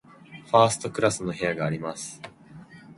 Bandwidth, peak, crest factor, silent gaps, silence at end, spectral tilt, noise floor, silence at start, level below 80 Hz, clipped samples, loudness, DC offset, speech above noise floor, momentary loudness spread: 11.5 kHz; -4 dBFS; 24 dB; none; 0.05 s; -4.5 dB/octave; -47 dBFS; 0.3 s; -60 dBFS; under 0.1%; -25 LUFS; under 0.1%; 23 dB; 22 LU